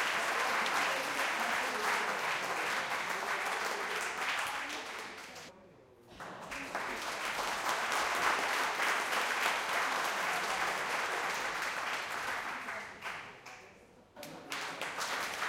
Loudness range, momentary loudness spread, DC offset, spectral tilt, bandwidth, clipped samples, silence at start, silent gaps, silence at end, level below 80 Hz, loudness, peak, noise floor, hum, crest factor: 8 LU; 14 LU; under 0.1%; -0.5 dB/octave; 17 kHz; under 0.1%; 0 s; none; 0 s; -72 dBFS; -34 LUFS; -16 dBFS; -59 dBFS; none; 20 dB